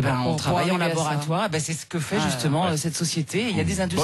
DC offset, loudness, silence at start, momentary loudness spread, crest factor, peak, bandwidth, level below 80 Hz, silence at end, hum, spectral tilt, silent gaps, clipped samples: under 0.1%; -24 LUFS; 0 s; 3 LU; 10 dB; -12 dBFS; 12.5 kHz; -50 dBFS; 0 s; none; -4.5 dB/octave; none; under 0.1%